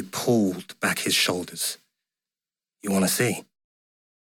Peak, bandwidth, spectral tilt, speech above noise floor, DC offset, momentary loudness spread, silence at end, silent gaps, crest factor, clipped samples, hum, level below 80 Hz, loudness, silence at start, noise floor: -8 dBFS; 17.5 kHz; -3.5 dB/octave; over 66 dB; under 0.1%; 10 LU; 0.85 s; none; 18 dB; under 0.1%; none; -70 dBFS; -24 LUFS; 0 s; under -90 dBFS